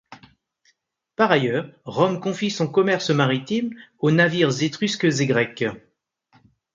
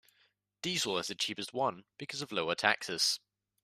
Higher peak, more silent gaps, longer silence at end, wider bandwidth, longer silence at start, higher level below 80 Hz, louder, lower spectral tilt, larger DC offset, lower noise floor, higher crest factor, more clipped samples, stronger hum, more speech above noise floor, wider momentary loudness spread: first, -2 dBFS vs -10 dBFS; neither; first, 0.95 s vs 0.45 s; second, 9 kHz vs 15 kHz; second, 0.1 s vs 0.65 s; first, -64 dBFS vs -78 dBFS; first, -21 LUFS vs -33 LUFS; first, -5.5 dB/octave vs -2 dB/octave; neither; second, -67 dBFS vs -73 dBFS; about the same, 22 dB vs 26 dB; neither; neither; first, 46 dB vs 39 dB; about the same, 10 LU vs 10 LU